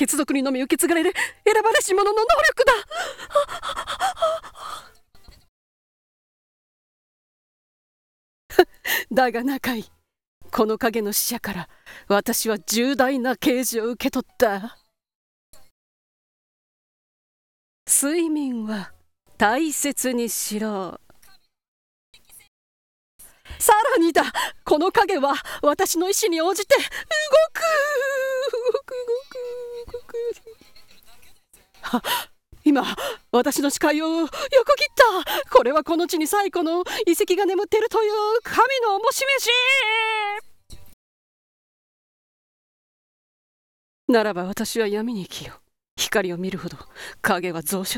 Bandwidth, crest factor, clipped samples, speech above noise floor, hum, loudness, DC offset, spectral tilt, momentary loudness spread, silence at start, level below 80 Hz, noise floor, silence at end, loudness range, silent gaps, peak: 18 kHz; 22 dB; under 0.1%; 33 dB; none; -21 LUFS; under 0.1%; -2.5 dB/octave; 14 LU; 0 s; -54 dBFS; -54 dBFS; 0 s; 10 LU; 5.48-8.49 s, 10.27-10.41 s, 15.15-15.53 s, 15.71-17.86 s, 21.68-22.13 s, 22.48-23.19 s, 40.93-44.08 s, 45.91-45.97 s; 0 dBFS